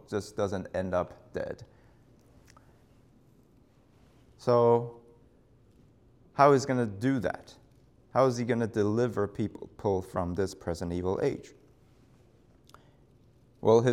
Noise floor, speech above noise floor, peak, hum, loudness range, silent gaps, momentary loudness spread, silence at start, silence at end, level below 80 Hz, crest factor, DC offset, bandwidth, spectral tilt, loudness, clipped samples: -62 dBFS; 34 dB; -8 dBFS; none; 10 LU; none; 14 LU; 0.1 s; 0 s; -62 dBFS; 24 dB; under 0.1%; 13 kHz; -7 dB/octave; -29 LUFS; under 0.1%